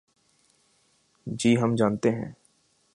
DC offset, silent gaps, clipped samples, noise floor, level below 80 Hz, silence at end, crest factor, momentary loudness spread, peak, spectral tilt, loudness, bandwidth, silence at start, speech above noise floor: under 0.1%; none; under 0.1%; -67 dBFS; -62 dBFS; 0.6 s; 20 dB; 17 LU; -8 dBFS; -6 dB/octave; -25 LUFS; 11.5 kHz; 1.25 s; 43 dB